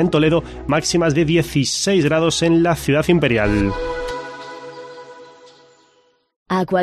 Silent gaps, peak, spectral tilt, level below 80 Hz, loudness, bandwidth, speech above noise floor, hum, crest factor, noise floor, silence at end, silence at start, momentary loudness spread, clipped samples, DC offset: 6.36-6.46 s; -4 dBFS; -5 dB/octave; -38 dBFS; -17 LUFS; 13.5 kHz; 42 dB; none; 14 dB; -58 dBFS; 0 s; 0 s; 18 LU; under 0.1%; under 0.1%